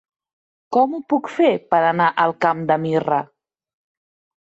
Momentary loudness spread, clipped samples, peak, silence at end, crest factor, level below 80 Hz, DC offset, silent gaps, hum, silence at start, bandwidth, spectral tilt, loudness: 6 LU; under 0.1%; -4 dBFS; 1.15 s; 16 dB; -66 dBFS; under 0.1%; none; none; 0.7 s; 8 kHz; -7 dB/octave; -19 LUFS